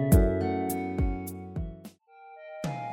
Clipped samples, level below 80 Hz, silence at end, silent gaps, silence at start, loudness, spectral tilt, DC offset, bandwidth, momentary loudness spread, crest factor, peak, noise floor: under 0.1%; -34 dBFS; 0 s; none; 0 s; -30 LUFS; -7.5 dB/octave; under 0.1%; 19 kHz; 24 LU; 20 dB; -10 dBFS; -52 dBFS